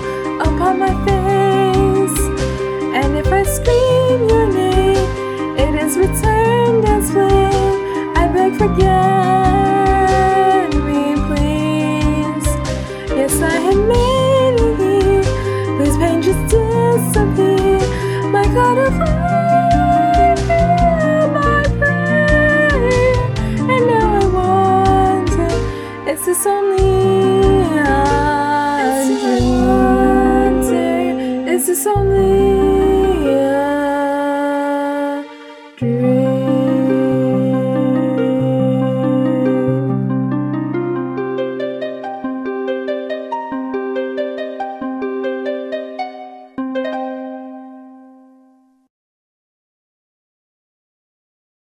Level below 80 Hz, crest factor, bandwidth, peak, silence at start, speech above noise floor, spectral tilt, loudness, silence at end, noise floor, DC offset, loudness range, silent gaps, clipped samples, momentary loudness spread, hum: -26 dBFS; 14 dB; 19 kHz; 0 dBFS; 0 s; 39 dB; -6 dB/octave; -15 LUFS; 3.75 s; -52 dBFS; under 0.1%; 9 LU; none; under 0.1%; 10 LU; none